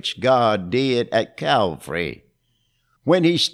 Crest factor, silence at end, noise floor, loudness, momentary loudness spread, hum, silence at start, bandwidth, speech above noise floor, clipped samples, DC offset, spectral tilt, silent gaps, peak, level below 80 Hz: 18 dB; 0.05 s; -67 dBFS; -20 LUFS; 9 LU; none; 0.05 s; 14.5 kHz; 48 dB; under 0.1%; under 0.1%; -5 dB/octave; none; -4 dBFS; -56 dBFS